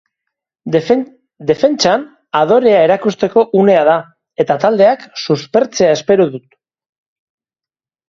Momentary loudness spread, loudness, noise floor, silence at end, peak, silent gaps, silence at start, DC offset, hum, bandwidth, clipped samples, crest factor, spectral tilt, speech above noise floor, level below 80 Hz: 10 LU; -13 LUFS; under -90 dBFS; 1.7 s; 0 dBFS; none; 0.65 s; under 0.1%; none; 7.6 kHz; under 0.1%; 14 dB; -5 dB/octave; over 78 dB; -56 dBFS